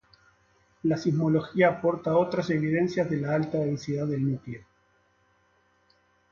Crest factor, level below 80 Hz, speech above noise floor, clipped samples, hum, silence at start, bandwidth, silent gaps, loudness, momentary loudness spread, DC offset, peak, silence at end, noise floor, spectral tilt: 20 dB; -64 dBFS; 41 dB; under 0.1%; none; 0.85 s; 7.2 kHz; none; -27 LUFS; 7 LU; under 0.1%; -8 dBFS; 1.7 s; -67 dBFS; -8 dB/octave